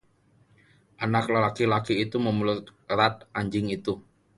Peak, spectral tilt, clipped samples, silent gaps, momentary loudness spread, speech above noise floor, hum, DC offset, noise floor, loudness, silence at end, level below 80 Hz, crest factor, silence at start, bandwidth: -6 dBFS; -6.5 dB/octave; under 0.1%; none; 9 LU; 37 dB; none; under 0.1%; -63 dBFS; -26 LUFS; 0.35 s; -58 dBFS; 20 dB; 1 s; 11.5 kHz